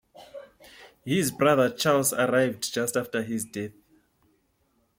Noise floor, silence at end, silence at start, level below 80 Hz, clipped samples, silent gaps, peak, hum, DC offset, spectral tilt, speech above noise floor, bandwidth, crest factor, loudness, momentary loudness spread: -70 dBFS; 1.3 s; 0.2 s; -66 dBFS; under 0.1%; none; -10 dBFS; none; under 0.1%; -4 dB/octave; 45 dB; 16.5 kHz; 18 dB; -25 LUFS; 22 LU